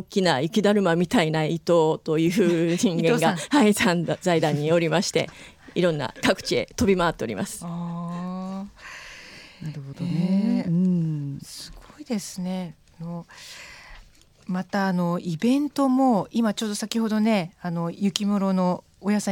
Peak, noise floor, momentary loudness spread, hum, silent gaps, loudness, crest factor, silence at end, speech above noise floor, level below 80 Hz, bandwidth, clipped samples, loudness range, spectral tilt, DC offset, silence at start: -2 dBFS; -51 dBFS; 17 LU; none; none; -23 LUFS; 22 dB; 0 s; 29 dB; -54 dBFS; 17 kHz; under 0.1%; 9 LU; -5.5 dB/octave; under 0.1%; 0 s